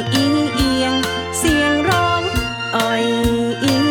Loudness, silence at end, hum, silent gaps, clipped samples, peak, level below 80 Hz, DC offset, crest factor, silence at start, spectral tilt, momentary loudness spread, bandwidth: -17 LUFS; 0 s; none; none; under 0.1%; -2 dBFS; -34 dBFS; under 0.1%; 14 dB; 0 s; -4.5 dB/octave; 4 LU; over 20 kHz